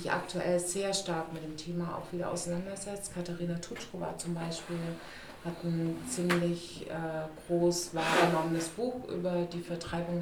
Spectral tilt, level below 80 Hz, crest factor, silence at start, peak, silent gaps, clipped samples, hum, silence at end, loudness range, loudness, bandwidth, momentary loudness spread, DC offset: -4.5 dB/octave; -58 dBFS; 20 dB; 0 s; -14 dBFS; none; under 0.1%; none; 0 s; 6 LU; -34 LUFS; 18 kHz; 10 LU; under 0.1%